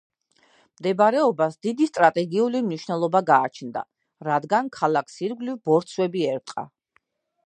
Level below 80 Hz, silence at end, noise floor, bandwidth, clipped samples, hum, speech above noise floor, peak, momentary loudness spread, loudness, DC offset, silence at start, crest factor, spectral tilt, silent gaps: -76 dBFS; 0.8 s; -68 dBFS; 10 kHz; under 0.1%; none; 46 dB; -2 dBFS; 14 LU; -23 LUFS; under 0.1%; 0.8 s; 22 dB; -6 dB/octave; none